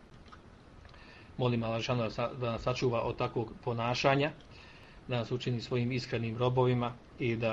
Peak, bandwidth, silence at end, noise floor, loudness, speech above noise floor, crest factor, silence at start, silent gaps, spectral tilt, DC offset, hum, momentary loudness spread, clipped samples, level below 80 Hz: -12 dBFS; 7.6 kHz; 0 s; -54 dBFS; -33 LUFS; 22 dB; 20 dB; 0 s; none; -6.5 dB/octave; under 0.1%; none; 22 LU; under 0.1%; -56 dBFS